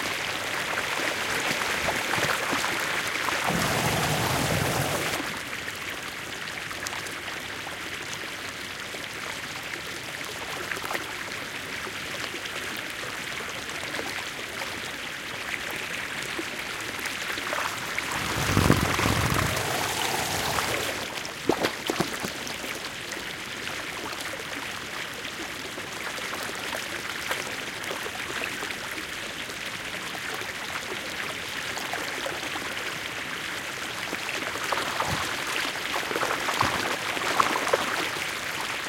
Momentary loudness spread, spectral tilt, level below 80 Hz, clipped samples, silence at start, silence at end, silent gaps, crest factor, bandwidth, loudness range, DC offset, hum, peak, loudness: 8 LU; -3 dB/octave; -50 dBFS; under 0.1%; 0 s; 0 s; none; 28 dB; 17 kHz; 7 LU; under 0.1%; none; -2 dBFS; -29 LUFS